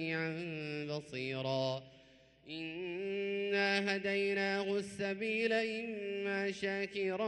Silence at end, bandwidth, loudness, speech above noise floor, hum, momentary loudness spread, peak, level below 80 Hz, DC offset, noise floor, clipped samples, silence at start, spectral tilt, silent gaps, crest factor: 0 s; 11.5 kHz; -36 LUFS; 27 dB; none; 8 LU; -20 dBFS; -76 dBFS; under 0.1%; -63 dBFS; under 0.1%; 0 s; -5 dB/octave; none; 18 dB